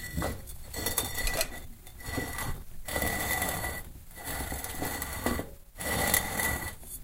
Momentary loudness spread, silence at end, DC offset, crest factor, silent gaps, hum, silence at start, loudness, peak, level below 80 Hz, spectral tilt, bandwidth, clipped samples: 15 LU; 0 s; under 0.1%; 26 dB; none; none; 0 s; -32 LUFS; -6 dBFS; -42 dBFS; -3 dB/octave; 17 kHz; under 0.1%